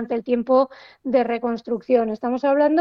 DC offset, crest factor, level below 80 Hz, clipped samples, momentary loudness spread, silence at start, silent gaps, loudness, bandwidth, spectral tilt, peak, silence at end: under 0.1%; 14 dB; -62 dBFS; under 0.1%; 8 LU; 0 s; none; -21 LUFS; 6.2 kHz; -7.5 dB/octave; -6 dBFS; 0 s